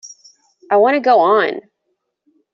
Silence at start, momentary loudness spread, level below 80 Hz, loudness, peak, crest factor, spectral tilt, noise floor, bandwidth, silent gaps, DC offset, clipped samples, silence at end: 0.05 s; 9 LU; -70 dBFS; -14 LUFS; -2 dBFS; 14 dB; -2 dB/octave; -71 dBFS; 7.4 kHz; none; under 0.1%; under 0.1%; 0.95 s